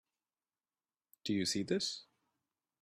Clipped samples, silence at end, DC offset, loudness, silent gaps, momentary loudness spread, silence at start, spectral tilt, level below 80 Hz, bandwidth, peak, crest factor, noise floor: under 0.1%; 0.8 s; under 0.1%; -37 LUFS; none; 11 LU; 1.25 s; -3.5 dB/octave; -80 dBFS; 14 kHz; -20 dBFS; 20 dB; under -90 dBFS